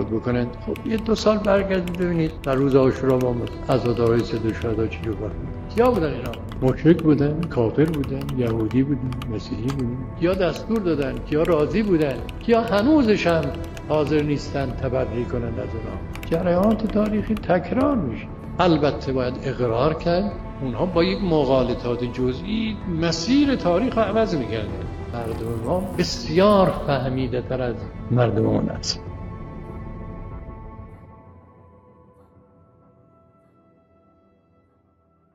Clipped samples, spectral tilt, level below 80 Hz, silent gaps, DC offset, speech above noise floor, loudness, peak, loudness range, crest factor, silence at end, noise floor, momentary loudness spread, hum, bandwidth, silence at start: under 0.1%; -7 dB/octave; -38 dBFS; none; under 0.1%; 40 dB; -22 LUFS; -2 dBFS; 4 LU; 20 dB; 3.95 s; -61 dBFS; 12 LU; none; 16 kHz; 0 s